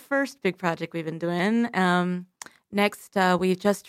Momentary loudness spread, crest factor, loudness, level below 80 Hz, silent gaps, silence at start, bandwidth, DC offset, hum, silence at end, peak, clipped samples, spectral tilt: 9 LU; 18 dB; -25 LUFS; -66 dBFS; none; 0.1 s; 15.5 kHz; under 0.1%; none; 0 s; -8 dBFS; under 0.1%; -5.5 dB/octave